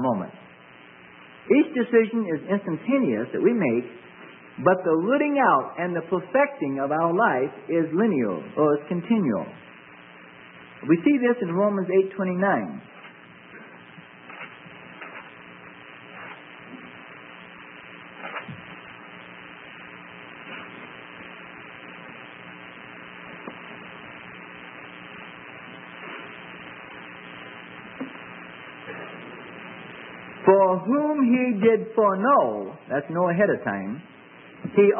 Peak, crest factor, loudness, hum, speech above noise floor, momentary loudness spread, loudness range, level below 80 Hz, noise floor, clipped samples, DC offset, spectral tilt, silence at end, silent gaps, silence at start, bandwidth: -4 dBFS; 22 dB; -23 LUFS; none; 26 dB; 22 LU; 18 LU; -72 dBFS; -48 dBFS; under 0.1%; under 0.1%; -11 dB/octave; 0 s; none; 0 s; 3.6 kHz